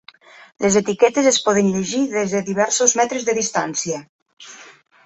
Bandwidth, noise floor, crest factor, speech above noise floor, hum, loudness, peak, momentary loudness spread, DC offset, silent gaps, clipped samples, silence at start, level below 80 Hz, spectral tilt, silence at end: 8.4 kHz; -46 dBFS; 18 dB; 27 dB; none; -18 LUFS; -2 dBFS; 9 LU; under 0.1%; 4.09-4.26 s, 4.33-4.37 s; under 0.1%; 0.6 s; -60 dBFS; -3 dB/octave; 0.35 s